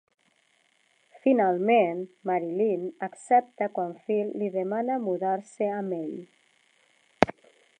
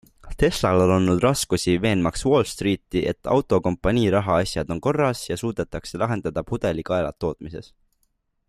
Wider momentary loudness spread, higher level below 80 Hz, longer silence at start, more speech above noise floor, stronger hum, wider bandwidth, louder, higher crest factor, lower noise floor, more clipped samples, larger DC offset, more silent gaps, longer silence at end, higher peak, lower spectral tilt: first, 11 LU vs 8 LU; second, -64 dBFS vs -42 dBFS; first, 1.25 s vs 0.25 s; second, 41 dB vs 48 dB; neither; second, 10 kHz vs 15 kHz; second, -27 LUFS vs -22 LUFS; first, 28 dB vs 16 dB; about the same, -67 dBFS vs -70 dBFS; neither; neither; neither; second, 0.5 s vs 0.85 s; first, 0 dBFS vs -6 dBFS; about the same, -6.5 dB/octave vs -5.5 dB/octave